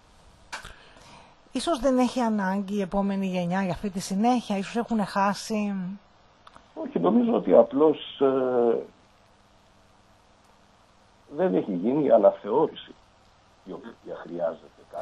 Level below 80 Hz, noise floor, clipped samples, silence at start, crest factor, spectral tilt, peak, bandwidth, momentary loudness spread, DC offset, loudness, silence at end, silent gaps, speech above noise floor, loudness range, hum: -56 dBFS; -58 dBFS; under 0.1%; 0.5 s; 22 dB; -6.5 dB/octave; -4 dBFS; 12 kHz; 21 LU; under 0.1%; -25 LUFS; 0 s; none; 34 dB; 6 LU; none